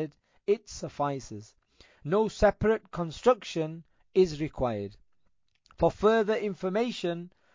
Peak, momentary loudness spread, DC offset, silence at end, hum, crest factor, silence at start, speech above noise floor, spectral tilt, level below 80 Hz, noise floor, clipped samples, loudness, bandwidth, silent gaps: -10 dBFS; 15 LU; under 0.1%; 0.25 s; none; 20 dB; 0 s; 45 dB; -6 dB/octave; -50 dBFS; -73 dBFS; under 0.1%; -29 LUFS; 7.6 kHz; none